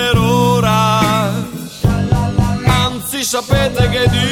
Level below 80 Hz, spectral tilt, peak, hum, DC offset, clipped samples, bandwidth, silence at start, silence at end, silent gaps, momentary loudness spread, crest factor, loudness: -28 dBFS; -5 dB/octave; 0 dBFS; none; under 0.1%; under 0.1%; 17.5 kHz; 0 s; 0 s; none; 6 LU; 12 dB; -14 LUFS